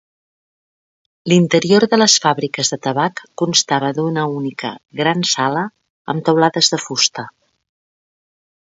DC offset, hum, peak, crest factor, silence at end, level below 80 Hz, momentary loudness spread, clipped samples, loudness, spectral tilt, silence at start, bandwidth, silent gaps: under 0.1%; none; 0 dBFS; 18 dB; 1.35 s; -64 dBFS; 14 LU; under 0.1%; -16 LUFS; -3.5 dB/octave; 1.25 s; 8 kHz; 5.90-6.05 s